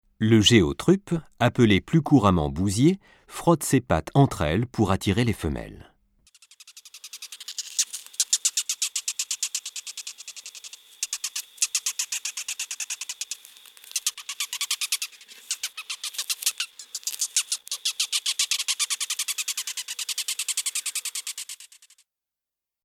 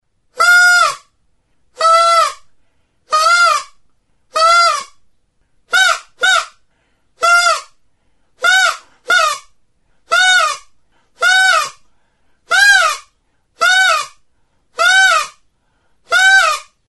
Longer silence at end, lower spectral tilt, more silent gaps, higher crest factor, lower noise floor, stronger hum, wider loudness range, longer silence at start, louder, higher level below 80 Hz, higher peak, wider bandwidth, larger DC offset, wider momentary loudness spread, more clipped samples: first, 1.2 s vs 0.25 s; first, -3.5 dB/octave vs 3 dB/octave; neither; first, 22 dB vs 14 dB; first, -88 dBFS vs -60 dBFS; neither; first, 7 LU vs 2 LU; second, 0.2 s vs 0.35 s; second, -25 LUFS vs -11 LUFS; first, -48 dBFS vs -58 dBFS; second, -4 dBFS vs 0 dBFS; first, 17.5 kHz vs 12 kHz; neither; about the same, 15 LU vs 13 LU; neither